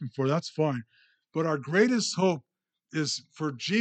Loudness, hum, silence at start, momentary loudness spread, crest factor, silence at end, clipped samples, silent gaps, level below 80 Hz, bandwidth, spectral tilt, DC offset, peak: -28 LUFS; none; 0 s; 12 LU; 18 dB; 0 s; under 0.1%; none; -82 dBFS; 9.2 kHz; -5 dB/octave; under 0.1%; -10 dBFS